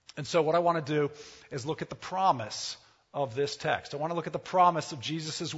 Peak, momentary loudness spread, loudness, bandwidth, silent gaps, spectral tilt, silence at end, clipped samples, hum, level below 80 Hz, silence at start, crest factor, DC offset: -10 dBFS; 13 LU; -30 LUFS; 8 kHz; none; -4.5 dB/octave; 0 s; under 0.1%; none; -68 dBFS; 0.15 s; 20 dB; under 0.1%